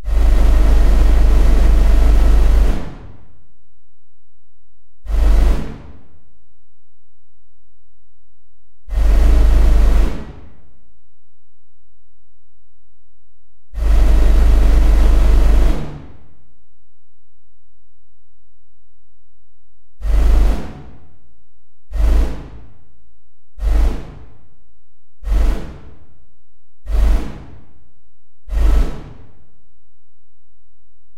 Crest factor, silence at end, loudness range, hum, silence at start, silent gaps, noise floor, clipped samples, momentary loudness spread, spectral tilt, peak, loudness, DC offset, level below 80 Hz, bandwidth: 14 dB; 0 s; 9 LU; none; 0 s; none; -65 dBFS; under 0.1%; 20 LU; -7 dB/octave; -2 dBFS; -17 LUFS; under 0.1%; -16 dBFS; 8.6 kHz